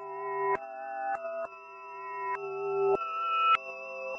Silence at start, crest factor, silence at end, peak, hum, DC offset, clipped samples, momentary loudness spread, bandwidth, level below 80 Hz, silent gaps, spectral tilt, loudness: 0 s; 20 dB; 0 s; -12 dBFS; none; under 0.1%; under 0.1%; 14 LU; 6.2 kHz; -74 dBFS; none; -4.5 dB/octave; -31 LUFS